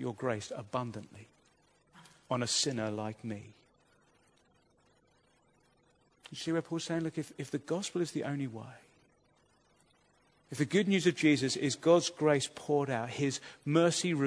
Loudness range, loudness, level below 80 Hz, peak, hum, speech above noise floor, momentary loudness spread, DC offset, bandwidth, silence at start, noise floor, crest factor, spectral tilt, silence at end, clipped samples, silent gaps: 13 LU; -32 LUFS; -76 dBFS; -12 dBFS; none; 37 dB; 16 LU; under 0.1%; 11 kHz; 0 s; -70 dBFS; 22 dB; -4.5 dB/octave; 0 s; under 0.1%; none